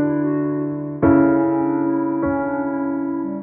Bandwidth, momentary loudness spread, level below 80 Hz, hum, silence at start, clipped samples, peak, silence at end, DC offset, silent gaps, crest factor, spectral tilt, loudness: 2.8 kHz; 8 LU; -48 dBFS; none; 0 s; under 0.1%; -4 dBFS; 0 s; under 0.1%; none; 14 dB; -11 dB/octave; -19 LUFS